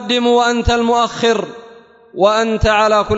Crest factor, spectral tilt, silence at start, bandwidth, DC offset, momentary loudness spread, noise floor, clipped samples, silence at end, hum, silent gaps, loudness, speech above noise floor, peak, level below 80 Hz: 14 dB; -4.5 dB/octave; 0 s; 8 kHz; under 0.1%; 6 LU; -42 dBFS; under 0.1%; 0 s; none; none; -14 LUFS; 28 dB; 0 dBFS; -30 dBFS